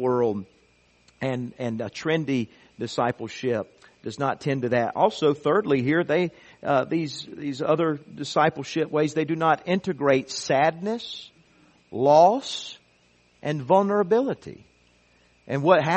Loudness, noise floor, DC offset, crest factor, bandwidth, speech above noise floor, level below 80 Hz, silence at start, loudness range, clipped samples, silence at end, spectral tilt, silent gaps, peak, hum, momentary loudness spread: -24 LUFS; -61 dBFS; under 0.1%; 22 dB; 8.4 kHz; 38 dB; -66 dBFS; 0 s; 5 LU; under 0.1%; 0 s; -6 dB/octave; none; -4 dBFS; none; 14 LU